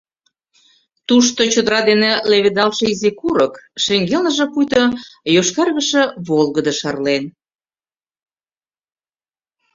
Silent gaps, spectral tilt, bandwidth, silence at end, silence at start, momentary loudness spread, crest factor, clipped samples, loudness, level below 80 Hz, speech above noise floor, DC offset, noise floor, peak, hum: none; -3.5 dB/octave; 7.8 kHz; 2.45 s; 1.1 s; 6 LU; 16 dB; under 0.1%; -16 LUFS; -56 dBFS; over 74 dB; under 0.1%; under -90 dBFS; 0 dBFS; none